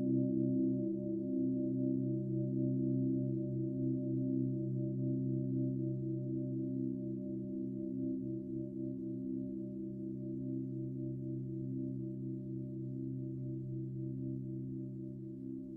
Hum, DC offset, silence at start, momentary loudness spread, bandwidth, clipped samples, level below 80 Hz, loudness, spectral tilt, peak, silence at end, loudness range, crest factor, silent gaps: none; under 0.1%; 0 s; 8 LU; 0.9 kHz; under 0.1%; -68 dBFS; -39 LUFS; -14.5 dB/octave; -24 dBFS; 0 s; 6 LU; 14 dB; none